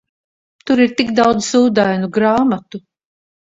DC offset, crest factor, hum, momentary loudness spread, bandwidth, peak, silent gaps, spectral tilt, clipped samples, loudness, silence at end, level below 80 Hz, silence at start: under 0.1%; 16 dB; none; 17 LU; 7.8 kHz; 0 dBFS; none; -5 dB/octave; under 0.1%; -15 LUFS; 0.65 s; -54 dBFS; 0.65 s